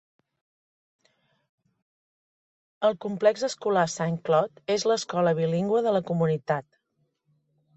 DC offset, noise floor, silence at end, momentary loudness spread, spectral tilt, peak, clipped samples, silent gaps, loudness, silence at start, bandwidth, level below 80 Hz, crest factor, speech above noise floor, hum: under 0.1%; -74 dBFS; 1.15 s; 4 LU; -5.5 dB/octave; -10 dBFS; under 0.1%; none; -26 LUFS; 2.8 s; 8.2 kHz; -70 dBFS; 18 dB; 50 dB; none